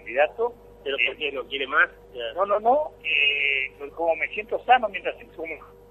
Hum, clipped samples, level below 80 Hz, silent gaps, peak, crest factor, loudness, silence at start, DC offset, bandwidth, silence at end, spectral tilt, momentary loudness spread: 50 Hz at -55 dBFS; under 0.1%; -56 dBFS; none; -6 dBFS; 20 dB; -23 LUFS; 0.05 s; under 0.1%; 12 kHz; 0.25 s; -4 dB/octave; 15 LU